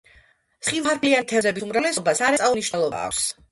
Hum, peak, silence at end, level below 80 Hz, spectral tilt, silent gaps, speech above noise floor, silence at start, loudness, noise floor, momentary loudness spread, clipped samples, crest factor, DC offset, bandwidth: none; -6 dBFS; 0.2 s; -58 dBFS; -2.5 dB/octave; none; 35 dB; 0.6 s; -22 LUFS; -57 dBFS; 5 LU; under 0.1%; 18 dB; under 0.1%; 12 kHz